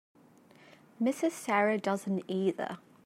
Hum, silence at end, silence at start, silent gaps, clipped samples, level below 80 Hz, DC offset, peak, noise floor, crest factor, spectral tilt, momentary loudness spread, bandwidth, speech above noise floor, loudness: none; 0.25 s; 1 s; none; under 0.1%; -84 dBFS; under 0.1%; -14 dBFS; -59 dBFS; 20 dB; -5.5 dB/octave; 6 LU; 16 kHz; 28 dB; -31 LUFS